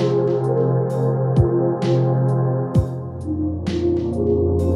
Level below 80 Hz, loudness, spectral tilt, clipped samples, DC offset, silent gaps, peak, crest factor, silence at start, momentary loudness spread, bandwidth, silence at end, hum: -36 dBFS; -20 LUFS; -9.5 dB/octave; under 0.1%; under 0.1%; none; -4 dBFS; 16 dB; 0 s; 6 LU; 7.2 kHz; 0 s; none